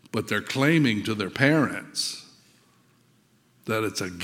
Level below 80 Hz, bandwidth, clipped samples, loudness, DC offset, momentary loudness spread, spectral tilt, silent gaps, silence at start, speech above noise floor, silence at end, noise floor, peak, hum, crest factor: -68 dBFS; 16.5 kHz; under 0.1%; -25 LUFS; under 0.1%; 9 LU; -5 dB/octave; none; 0.15 s; 38 dB; 0 s; -62 dBFS; -4 dBFS; none; 24 dB